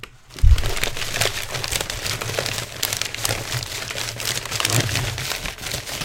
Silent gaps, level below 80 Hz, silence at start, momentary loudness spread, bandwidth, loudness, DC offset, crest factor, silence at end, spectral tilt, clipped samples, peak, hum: none; -26 dBFS; 0 s; 7 LU; 17 kHz; -23 LUFS; under 0.1%; 22 dB; 0 s; -2.5 dB/octave; under 0.1%; 0 dBFS; none